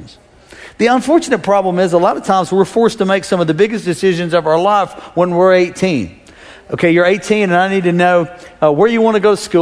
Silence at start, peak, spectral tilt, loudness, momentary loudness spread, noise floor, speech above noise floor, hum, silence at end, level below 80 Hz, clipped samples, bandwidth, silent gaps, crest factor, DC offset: 0 s; 0 dBFS; -6 dB/octave; -13 LUFS; 5 LU; -41 dBFS; 28 dB; none; 0 s; -50 dBFS; under 0.1%; 11 kHz; none; 12 dB; under 0.1%